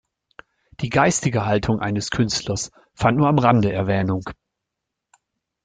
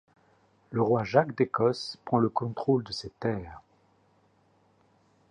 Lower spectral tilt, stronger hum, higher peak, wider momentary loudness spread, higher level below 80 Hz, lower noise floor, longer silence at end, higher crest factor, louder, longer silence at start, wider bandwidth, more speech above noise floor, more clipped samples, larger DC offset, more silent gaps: second, -5.5 dB/octave vs -7 dB/octave; second, none vs 50 Hz at -60 dBFS; first, -2 dBFS vs -6 dBFS; about the same, 11 LU vs 11 LU; first, -48 dBFS vs -62 dBFS; first, -82 dBFS vs -66 dBFS; second, 1.3 s vs 1.7 s; about the same, 20 dB vs 24 dB; first, -20 LUFS vs -28 LUFS; about the same, 0.8 s vs 0.7 s; about the same, 9.6 kHz vs 10.5 kHz; first, 62 dB vs 38 dB; neither; neither; neither